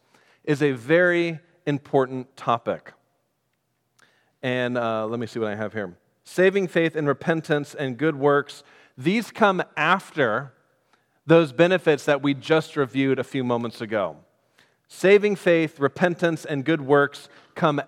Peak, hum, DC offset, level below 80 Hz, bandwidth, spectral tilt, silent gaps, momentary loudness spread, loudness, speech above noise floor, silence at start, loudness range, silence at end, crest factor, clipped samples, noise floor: -2 dBFS; none; under 0.1%; -76 dBFS; 14.5 kHz; -6.5 dB/octave; none; 12 LU; -23 LUFS; 51 dB; 0.45 s; 7 LU; 0.05 s; 22 dB; under 0.1%; -73 dBFS